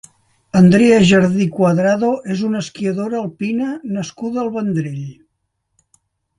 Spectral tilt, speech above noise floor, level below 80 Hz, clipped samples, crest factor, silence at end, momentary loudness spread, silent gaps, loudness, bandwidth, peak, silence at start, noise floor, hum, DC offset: -6.5 dB/octave; 56 dB; -52 dBFS; under 0.1%; 16 dB; 1.25 s; 13 LU; none; -16 LUFS; 11.5 kHz; 0 dBFS; 0.55 s; -71 dBFS; none; under 0.1%